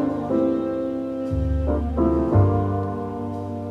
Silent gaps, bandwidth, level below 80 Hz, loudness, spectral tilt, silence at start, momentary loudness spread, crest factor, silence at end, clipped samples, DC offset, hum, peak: none; 5 kHz; -32 dBFS; -23 LUFS; -10.5 dB/octave; 0 s; 10 LU; 16 dB; 0 s; under 0.1%; under 0.1%; none; -6 dBFS